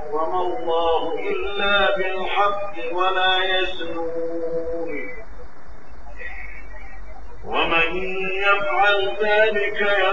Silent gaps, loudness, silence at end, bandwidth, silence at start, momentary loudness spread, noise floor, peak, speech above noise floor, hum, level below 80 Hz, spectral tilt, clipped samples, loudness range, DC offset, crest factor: none; -21 LUFS; 0 s; 7.6 kHz; 0 s; 18 LU; -42 dBFS; -4 dBFS; 21 dB; none; -44 dBFS; -5 dB/octave; under 0.1%; 10 LU; 6%; 18 dB